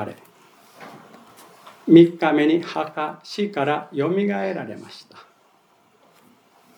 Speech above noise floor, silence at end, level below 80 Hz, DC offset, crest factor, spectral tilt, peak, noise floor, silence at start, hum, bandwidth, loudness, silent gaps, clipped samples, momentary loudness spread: 39 dB; 1.8 s; -76 dBFS; under 0.1%; 22 dB; -7.5 dB/octave; 0 dBFS; -59 dBFS; 0 s; none; 9.6 kHz; -20 LUFS; none; under 0.1%; 28 LU